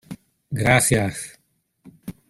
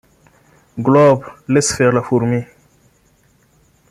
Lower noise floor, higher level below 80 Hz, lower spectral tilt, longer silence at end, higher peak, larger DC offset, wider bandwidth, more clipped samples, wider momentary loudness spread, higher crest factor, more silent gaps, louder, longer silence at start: first, -67 dBFS vs -55 dBFS; first, -46 dBFS vs -52 dBFS; second, -4 dB/octave vs -5.5 dB/octave; second, 0.2 s vs 1.45 s; about the same, -2 dBFS vs -2 dBFS; neither; about the same, 15.5 kHz vs 15 kHz; neither; first, 24 LU vs 11 LU; first, 22 dB vs 16 dB; neither; second, -19 LUFS vs -15 LUFS; second, 0.1 s vs 0.75 s